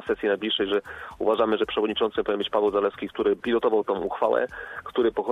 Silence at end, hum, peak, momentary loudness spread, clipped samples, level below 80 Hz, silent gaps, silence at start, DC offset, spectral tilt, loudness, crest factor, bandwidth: 0 s; none; -10 dBFS; 6 LU; under 0.1%; -56 dBFS; none; 0 s; under 0.1%; -6 dB/octave; -25 LUFS; 16 dB; 5.2 kHz